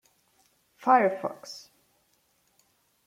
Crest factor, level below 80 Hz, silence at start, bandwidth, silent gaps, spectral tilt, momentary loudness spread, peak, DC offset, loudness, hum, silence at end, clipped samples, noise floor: 24 dB; -82 dBFS; 0.8 s; 15.5 kHz; none; -5 dB/octave; 21 LU; -8 dBFS; under 0.1%; -25 LUFS; none; 1.45 s; under 0.1%; -69 dBFS